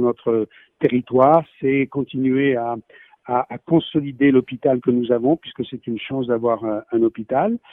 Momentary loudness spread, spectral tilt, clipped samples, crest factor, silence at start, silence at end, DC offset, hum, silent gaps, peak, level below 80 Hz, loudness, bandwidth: 9 LU; -10 dB/octave; under 0.1%; 18 dB; 0 s; 0.15 s; under 0.1%; none; none; -2 dBFS; -60 dBFS; -20 LUFS; 3.9 kHz